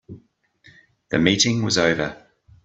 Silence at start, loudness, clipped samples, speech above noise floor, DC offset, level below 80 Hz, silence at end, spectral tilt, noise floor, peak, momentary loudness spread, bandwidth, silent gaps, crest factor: 0.1 s; -20 LUFS; under 0.1%; 37 dB; under 0.1%; -52 dBFS; 0.5 s; -3.5 dB/octave; -56 dBFS; -2 dBFS; 9 LU; 8.4 kHz; none; 22 dB